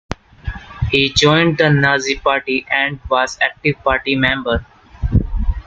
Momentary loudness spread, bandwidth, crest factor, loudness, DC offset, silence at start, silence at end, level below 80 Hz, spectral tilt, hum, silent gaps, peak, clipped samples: 14 LU; 9 kHz; 16 dB; -16 LUFS; under 0.1%; 0.1 s; 0.05 s; -28 dBFS; -5 dB/octave; none; none; 0 dBFS; under 0.1%